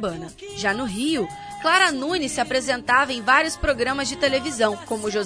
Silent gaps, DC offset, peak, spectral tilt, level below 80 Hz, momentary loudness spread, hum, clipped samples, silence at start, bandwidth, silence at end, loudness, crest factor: none; under 0.1%; -4 dBFS; -3 dB/octave; -44 dBFS; 9 LU; none; under 0.1%; 0 s; 11 kHz; 0 s; -21 LUFS; 20 dB